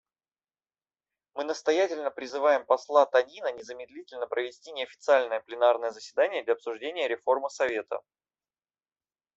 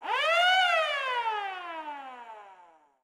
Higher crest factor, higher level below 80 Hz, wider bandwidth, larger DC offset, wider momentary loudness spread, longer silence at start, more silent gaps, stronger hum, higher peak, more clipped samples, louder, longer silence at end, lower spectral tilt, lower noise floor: first, 22 dB vs 16 dB; first, -78 dBFS vs -88 dBFS; second, 8 kHz vs 16 kHz; neither; second, 14 LU vs 22 LU; first, 1.35 s vs 0 s; neither; neither; first, -8 dBFS vs -14 dBFS; neither; about the same, -28 LUFS vs -26 LUFS; first, 1.35 s vs 0.5 s; first, -2 dB/octave vs 1.5 dB/octave; first, under -90 dBFS vs -58 dBFS